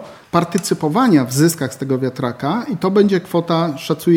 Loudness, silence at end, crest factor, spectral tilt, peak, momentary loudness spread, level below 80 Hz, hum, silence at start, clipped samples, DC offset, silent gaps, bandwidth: -17 LUFS; 0 s; 16 dB; -6 dB/octave; 0 dBFS; 7 LU; -58 dBFS; none; 0 s; under 0.1%; under 0.1%; none; 19 kHz